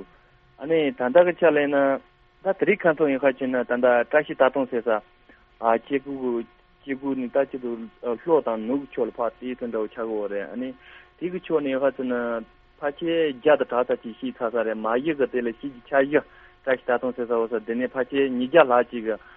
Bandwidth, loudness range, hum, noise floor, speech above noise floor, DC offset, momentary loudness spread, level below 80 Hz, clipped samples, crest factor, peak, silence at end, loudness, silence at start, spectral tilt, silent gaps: 4 kHz; 6 LU; none; -56 dBFS; 33 dB; under 0.1%; 12 LU; -62 dBFS; under 0.1%; 20 dB; -2 dBFS; 0.2 s; -24 LUFS; 0 s; -3.5 dB/octave; none